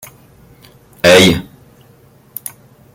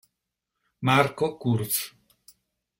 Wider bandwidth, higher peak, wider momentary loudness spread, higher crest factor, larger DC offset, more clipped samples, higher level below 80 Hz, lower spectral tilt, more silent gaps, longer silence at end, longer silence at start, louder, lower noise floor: about the same, 17 kHz vs 16.5 kHz; about the same, 0 dBFS vs -2 dBFS; first, 23 LU vs 8 LU; second, 16 dB vs 26 dB; neither; neither; first, -46 dBFS vs -62 dBFS; about the same, -4 dB/octave vs -4.5 dB/octave; neither; first, 1.5 s vs 0.9 s; first, 1.05 s vs 0.8 s; first, -10 LUFS vs -25 LUFS; second, -46 dBFS vs -83 dBFS